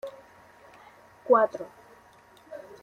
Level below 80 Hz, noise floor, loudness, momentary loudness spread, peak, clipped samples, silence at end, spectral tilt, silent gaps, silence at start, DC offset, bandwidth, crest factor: -74 dBFS; -56 dBFS; -24 LUFS; 24 LU; -8 dBFS; under 0.1%; 0.25 s; -6 dB/octave; none; 0.05 s; under 0.1%; 9.8 kHz; 22 dB